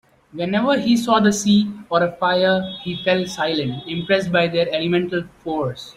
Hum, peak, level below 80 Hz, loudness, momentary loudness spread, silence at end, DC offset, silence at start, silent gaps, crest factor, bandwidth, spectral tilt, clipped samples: none; -2 dBFS; -56 dBFS; -19 LUFS; 10 LU; 0.05 s; under 0.1%; 0.35 s; none; 18 dB; 15 kHz; -5 dB/octave; under 0.1%